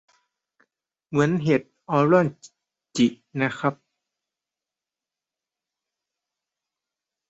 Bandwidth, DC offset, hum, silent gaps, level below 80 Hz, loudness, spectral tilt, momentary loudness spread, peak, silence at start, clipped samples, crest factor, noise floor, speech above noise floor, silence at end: 8.2 kHz; under 0.1%; none; none; -66 dBFS; -23 LUFS; -6.5 dB/octave; 9 LU; -6 dBFS; 1.1 s; under 0.1%; 22 dB; -89 dBFS; 68 dB; 3.55 s